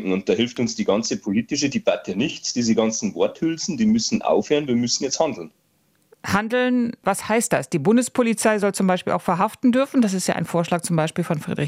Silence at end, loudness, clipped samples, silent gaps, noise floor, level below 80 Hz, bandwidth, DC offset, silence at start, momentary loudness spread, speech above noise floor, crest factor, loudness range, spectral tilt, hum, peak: 0 s; -21 LUFS; under 0.1%; none; -64 dBFS; -60 dBFS; 15.5 kHz; under 0.1%; 0 s; 5 LU; 43 dB; 16 dB; 2 LU; -4.5 dB/octave; none; -4 dBFS